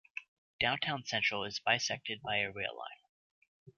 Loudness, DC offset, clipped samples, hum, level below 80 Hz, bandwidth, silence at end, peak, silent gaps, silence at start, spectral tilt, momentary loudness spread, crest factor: -34 LUFS; under 0.1%; under 0.1%; none; -68 dBFS; 7.2 kHz; 0.1 s; -14 dBFS; 0.28-0.59 s, 3.09-3.42 s, 3.48-3.66 s; 0.15 s; -0.5 dB/octave; 16 LU; 22 dB